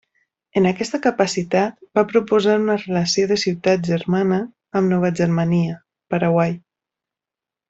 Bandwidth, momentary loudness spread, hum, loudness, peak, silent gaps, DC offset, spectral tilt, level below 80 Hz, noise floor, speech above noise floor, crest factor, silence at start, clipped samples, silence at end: 8 kHz; 6 LU; none; -19 LUFS; -2 dBFS; none; under 0.1%; -6 dB/octave; -58 dBFS; -88 dBFS; 70 dB; 16 dB; 0.55 s; under 0.1%; 1.1 s